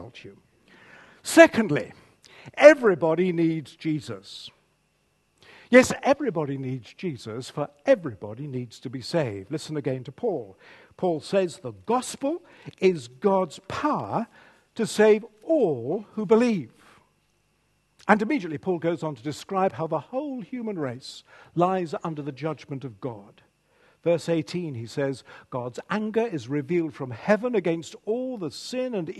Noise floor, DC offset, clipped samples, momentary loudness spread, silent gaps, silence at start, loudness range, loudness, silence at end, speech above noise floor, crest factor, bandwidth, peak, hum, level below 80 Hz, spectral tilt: -69 dBFS; under 0.1%; under 0.1%; 16 LU; none; 0 s; 10 LU; -25 LUFS; 0 s; 44 dB; 26 dB; 12.5 kHz; 0 dBFS; none; -66 dBFS; -5.5 dB/octave